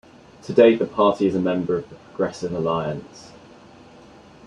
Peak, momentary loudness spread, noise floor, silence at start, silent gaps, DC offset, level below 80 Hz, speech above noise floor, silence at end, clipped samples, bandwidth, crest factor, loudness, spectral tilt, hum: -2 dBFS; 19 LU; -47 dBFS; 0.45 s; none; under 0.1%; -58 dBFS; 26 dB; 1.2 s; under 0.1%; 10 kHz; 20 dB; -21 LUFS; -7 dB/octave; none